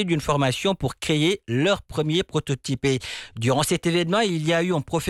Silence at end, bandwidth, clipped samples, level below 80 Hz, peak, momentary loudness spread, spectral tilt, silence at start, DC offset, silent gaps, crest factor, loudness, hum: 0 s; 15 kHz; under 0.1%; -50 dBFS; -10 dBFS; 5 LU; -5 dB/octave; 0 s; under 0.1%; none; 12 dB; -23 LUFS; none